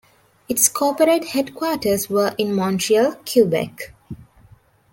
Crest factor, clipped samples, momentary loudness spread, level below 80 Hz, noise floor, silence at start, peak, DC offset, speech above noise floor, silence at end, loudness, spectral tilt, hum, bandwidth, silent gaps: 18 dB; under 0.1%; 18 LU; -56 dBFS; -52 dBFS; 0.5 s; -2 dBFS; under 0.1%; 33 dB; 0.7 s; -19 LUFS; -3.5 dB/octave; none; 17 kHz; none